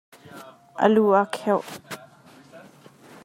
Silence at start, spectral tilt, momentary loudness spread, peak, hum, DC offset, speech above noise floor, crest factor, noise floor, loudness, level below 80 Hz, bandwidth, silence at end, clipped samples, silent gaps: 0.35 s; -6 dB/octave; 25 LU; -4 dBFS; none; under 0.1%; 30 dB; 22 dB; -50 dBFS; -21 LUFS; -74 dBFS; 16 kHz; 0.65 s; under 0.1%; none